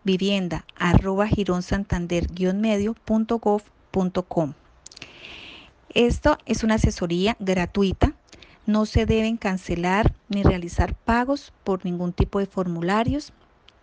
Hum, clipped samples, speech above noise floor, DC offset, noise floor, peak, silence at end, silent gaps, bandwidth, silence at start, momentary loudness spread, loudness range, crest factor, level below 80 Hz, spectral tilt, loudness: none; under 0.1%; 28 dB; under 0.1%; -50 dBFS; -4 dBFS; 0.55 s; none; 9.4 kHz; 0.05 s; 9 LU; 3 LU; 20 dB; -34 dBFS; -6.5 dB/octave; -23 LUFS